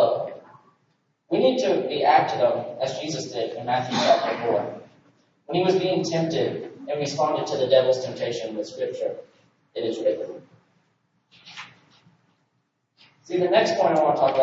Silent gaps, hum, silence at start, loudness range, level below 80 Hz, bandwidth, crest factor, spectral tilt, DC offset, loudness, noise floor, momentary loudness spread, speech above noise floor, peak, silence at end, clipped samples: none; none; 0 s; 10 LU; -72 dBFS; 8 kHz; 20 dB; -5 dB/octave; under 0.1%; -23 LUFS; -73 dBFS; 16 LU; 50 dB; -4 dBFS; 0 s; under 0.1%